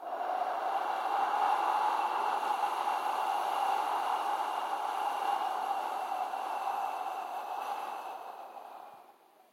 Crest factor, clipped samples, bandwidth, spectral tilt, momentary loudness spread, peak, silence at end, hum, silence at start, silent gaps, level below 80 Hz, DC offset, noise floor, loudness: 16 dB; under 0.1%; 16.5 kHz; -0.5 dB/octave; 12 LU; -18 dBFS; 0.4 s; none; 0 s; none; under -90 dBFS; under 0.1%; -60 dBFS; -33 LUFS